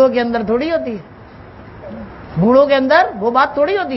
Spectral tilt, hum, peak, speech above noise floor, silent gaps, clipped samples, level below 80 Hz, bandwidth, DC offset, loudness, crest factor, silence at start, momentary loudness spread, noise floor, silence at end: -8 dB/octave; none; 0 dBFS; 23 dB; none; under 0.1%; -46 dBFS; 6 kHz; under 0.1%; -14 LUFS; 16 dB; 0 s; 20 LU; -37 dBFS; 0 s